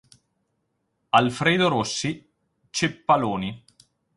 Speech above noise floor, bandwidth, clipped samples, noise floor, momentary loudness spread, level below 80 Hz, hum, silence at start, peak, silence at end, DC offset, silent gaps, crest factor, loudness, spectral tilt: 52 dB; 11.5 kHz; under 0.1%; -75 dBFS; 11 LU; -58 dBFS; none; 1.15 s; -4 dBFS; 0.6 s; under 0.1%; none; 22 dB; -23 LUFS; -4.5 dB/octave